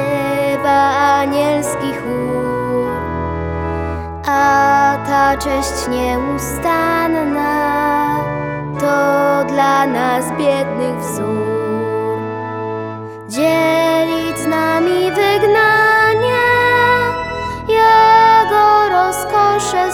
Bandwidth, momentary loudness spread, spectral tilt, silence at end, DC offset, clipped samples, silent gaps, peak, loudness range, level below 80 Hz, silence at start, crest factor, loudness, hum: 18.5 kHz; 11 LU; -4.5 dB/octave; 0 s; under 0.1%; under 0.1%; none; 0 dBFS; 6 LU; -40 dBFS; 0 s; 14 dB; -14 LUFS; none